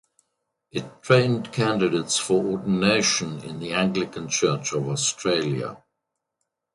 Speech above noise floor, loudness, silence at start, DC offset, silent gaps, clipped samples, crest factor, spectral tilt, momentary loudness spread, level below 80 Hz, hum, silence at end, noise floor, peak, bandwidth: 58 dB; -23 LUFS; 0.75 s; under 0.1%; none; under 0.1%; 22 dB; -4 dB/octave; 13 LU; -60 dBFS; none; 0.95 s; -81 dBFS; -4 dBFS; 11.5 kHz